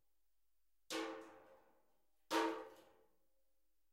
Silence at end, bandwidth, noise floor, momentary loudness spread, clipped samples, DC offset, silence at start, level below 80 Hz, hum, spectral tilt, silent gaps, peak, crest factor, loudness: 1.1 s; 16 kHz; -89 dBFS; 20 LU; under 0.1%; under 0.1%; 0.9 s; under -90 dBFS; none; -2 dB/octave; none; -26 dBFS; 22 dB; -44 LUFS